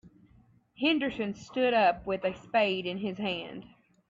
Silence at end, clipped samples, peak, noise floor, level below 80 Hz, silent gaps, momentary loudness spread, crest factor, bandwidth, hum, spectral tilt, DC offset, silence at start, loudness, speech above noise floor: 0.45 s; under 0.1%; -14 dBFS; -62 dBFS; -64 dBFS; none; 11 LU; 18 dB; 7.8 kHz; none; -5.5 dB/octave; under 0.1%; 0.05 s; -29 LUFS; 33 dB